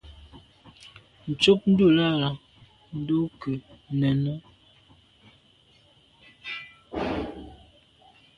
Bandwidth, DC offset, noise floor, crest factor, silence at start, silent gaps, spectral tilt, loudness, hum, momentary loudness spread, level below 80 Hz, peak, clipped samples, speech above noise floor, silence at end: 10.5 kHz; under 0.1%; -59 dBFS; 22 dB; 0.05 s; none; -6.5 dB/octave; -25 LUFS; none; 22 LU; -54 dBFS; -4 dBFS; under 0.1%; 37 dB; 0.8 s